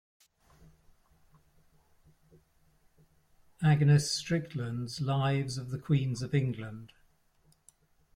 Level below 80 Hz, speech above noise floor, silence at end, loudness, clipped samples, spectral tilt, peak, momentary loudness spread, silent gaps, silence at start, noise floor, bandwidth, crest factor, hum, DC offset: -62 dBFS; 38 dB; 1.3 s; -30 LUFS; under 0.1%; -6 dB/octave; -14 dBFS; 13 LU; none; 3.6 s; -68 dBFS; 12.5 kHz; 20 dB; none; under 0.1%